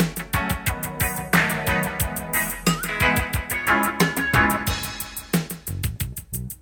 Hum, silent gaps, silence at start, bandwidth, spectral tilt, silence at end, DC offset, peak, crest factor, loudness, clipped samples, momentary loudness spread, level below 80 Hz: none; none; 0 s; over 20 kHz; -4 dB/octave; 0.05 s; under 0.1%; -4 dBFS; 20 dB; -23 LUFS; under 0.1%; 10 LU; -36 dBFS